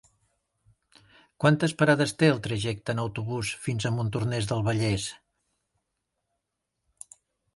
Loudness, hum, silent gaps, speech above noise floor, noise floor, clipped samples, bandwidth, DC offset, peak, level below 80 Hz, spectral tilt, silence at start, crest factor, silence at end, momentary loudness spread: -26 LUFS; none; none; 57 dB; -82 dBFS; under 0.1%; 11.5 kHz; under 0.1%; -6 dBFS; -56 dBFS; -5.5 dB/octave; 1.4 s; 22 dB; 2.4 s; 9 LU